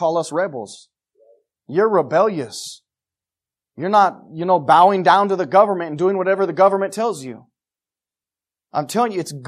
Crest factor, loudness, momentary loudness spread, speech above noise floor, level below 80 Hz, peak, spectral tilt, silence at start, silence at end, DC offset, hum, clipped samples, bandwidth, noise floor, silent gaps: 18 dB; -17 LUFS; 16 LU; over 73 dB; -72 dBFS; -2 dBFS; -5 dB/octave; 0 s; 0 s; under 0.1%; none; under 0.1%; 14 kHz; under -90 dBFS; none